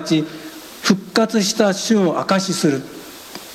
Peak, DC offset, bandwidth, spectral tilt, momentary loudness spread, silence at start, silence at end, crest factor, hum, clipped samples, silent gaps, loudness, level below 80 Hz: 0 dBFS; under 0.1%; 16 kHz; -4.5 dB/octave; 17 LU; 0 s; 0 s; 18 dB; none; under 0.1%; none; -18 LUFS; -60 dBFS